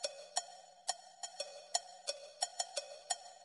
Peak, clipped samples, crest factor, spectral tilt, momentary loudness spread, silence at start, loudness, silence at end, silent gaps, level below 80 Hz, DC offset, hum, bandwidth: -16 dBFS; under 0.1%; 28 dB; 3 dB/octave; 7 LU; 0 s; -42 LUFS; 0 s; none; under -90 dBFS; under 0.1%; none; 11.5 kHz